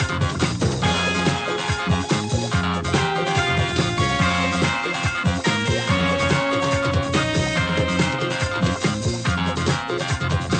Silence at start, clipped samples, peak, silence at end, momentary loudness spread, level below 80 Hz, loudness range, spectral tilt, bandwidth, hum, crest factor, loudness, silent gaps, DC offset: 0 s; under 0.1%; -6 dBFS; 0 s; 3 LU; -38 dBFS; 1 LU; -5 dB/octave; 9.2 kHz; none; 16 dB; -21 LUFS; none; under 0.1%